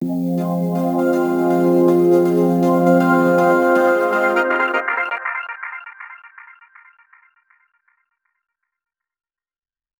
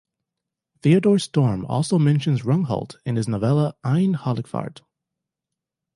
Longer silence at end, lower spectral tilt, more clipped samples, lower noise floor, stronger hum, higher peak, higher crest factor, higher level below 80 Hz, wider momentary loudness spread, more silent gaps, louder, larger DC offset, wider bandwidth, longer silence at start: first, 3.75 s vs 1.25 s; about the same, -7.5 dB/octave vs -7.5 dB/octave; neither; first, under -90 dBFS vs -85 dBFS; neither; about the same, -2 dBFS vs -4 dBFS; about the same, 16 dB vs 18 dB; second, -66 dBFS vs -56 dBFS; first, 14 LU vs 9 LU; neither; first, -16 LUFS vs -21 LUFS; neither; first, over 20 kHz vs 11.5 kHz; second, 0 s vs 0.85 s